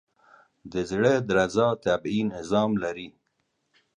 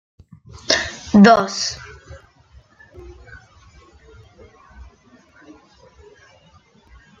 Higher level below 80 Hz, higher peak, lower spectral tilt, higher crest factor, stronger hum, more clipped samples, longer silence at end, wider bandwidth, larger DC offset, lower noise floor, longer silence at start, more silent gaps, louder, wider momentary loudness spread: second, -56 dBFS vs -50 dBFS; second, -8 dBFS vs 0 dBFS; first, -6 dB/octave vs -4.5 dB/octave; about the same, 18 dB vs 22 dB; neither; neither; second, 0.9 s vs 5.45 s; first, 10.5 kHz vs 7.6 kHz; neither; first, -75 dBFS vs -53 dBFS; about the same, 0.65 s vs 0.7 s; neither; second, -25 LUFS vs -15 LUFS; second, 11 LU vs 31 LU